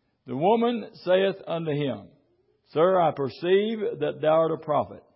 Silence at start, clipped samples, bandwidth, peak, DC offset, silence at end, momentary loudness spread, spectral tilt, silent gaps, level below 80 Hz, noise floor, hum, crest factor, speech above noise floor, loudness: 0.25 s; under 0.1%; 5.8 kHz; -10 dBFS; under 0.1%; 0.15 s; 9 LU; -10.5 dB/octave; none; -68 dBFS; -67 dBFS; none; 16 dB; 42 dB; -25 LUFS